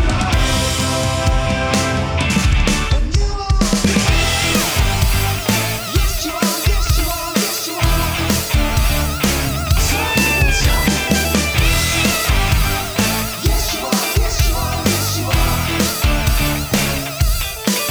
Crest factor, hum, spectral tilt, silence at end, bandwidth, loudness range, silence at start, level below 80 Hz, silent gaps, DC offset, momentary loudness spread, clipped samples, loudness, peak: 14 dB; none; -4 dB/octave; 0 s; over 20 kHz; 2 LU; 0 s; -20 dBFS; none; under 0.1%; 4 LU; under 0.1%; -16 LUFS; -2 dBFS